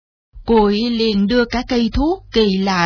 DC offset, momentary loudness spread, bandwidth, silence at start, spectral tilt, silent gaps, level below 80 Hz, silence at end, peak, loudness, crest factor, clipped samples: under 0.1%; 4 LU; 5.4 kHz; 0.35 s; -6 dB/octave; none; -32 dBFS; 0 s; -4 dBFS; -16 LUFS; 14 dB; under 0.1%